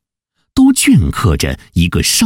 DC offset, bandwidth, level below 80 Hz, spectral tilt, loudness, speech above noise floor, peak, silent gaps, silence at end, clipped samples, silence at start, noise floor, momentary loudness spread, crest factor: under 0.1%; 17 kHz; -26 dBFS; -4.5 dB/octave; -12 LUFS; 56 dB; -2 dBFS; none; 0 s; under 0.1%; 0.55 s; -68 dBFS; 8 LU; 12 dB